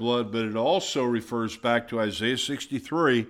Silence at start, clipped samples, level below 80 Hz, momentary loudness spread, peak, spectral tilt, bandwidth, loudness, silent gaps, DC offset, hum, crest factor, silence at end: 0 s; under 0.1%; -62 dBFS; 5 LU; -10 dBFS; -4.5 dB/octave; 15 kHz; -26 LUFS; none; under 0.1%; none; 16 dB; 0 s